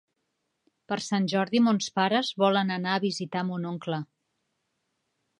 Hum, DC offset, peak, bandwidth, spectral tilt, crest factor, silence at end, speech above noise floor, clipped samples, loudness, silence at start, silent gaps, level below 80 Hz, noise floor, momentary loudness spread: none; under 0.1%; -8 dBFS; 11 kHz; -5 dB/octave; 20 dB; 1.35 s; 52 dB; under 0.1%; -27 LUFS; 0.9 s; none; -78 dBFS; -79 dBFS; 10 LU